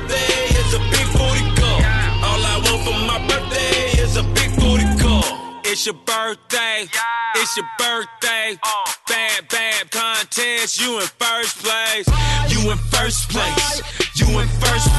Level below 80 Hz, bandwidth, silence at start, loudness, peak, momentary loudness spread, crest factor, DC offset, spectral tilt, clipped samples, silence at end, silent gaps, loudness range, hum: -24 dBFS; 12.5 kHz; 0 s; -18 LUFS; -4 dBFS; 4 LU; 14 dB; under 0.1%; -3.5 dB/octave; under 0.1%; 0 s; none; 2 LU; none